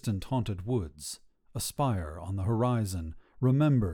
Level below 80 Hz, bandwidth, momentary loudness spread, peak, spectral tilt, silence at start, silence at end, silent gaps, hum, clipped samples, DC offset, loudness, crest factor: -48 dBFS; 18 kHz; 15 LU; -14 dBFS; -6.5 dB/octave; 0.05 s; 0 s; none; none; under 0.1%; under 0.1%; -31 LUFS; 14 dB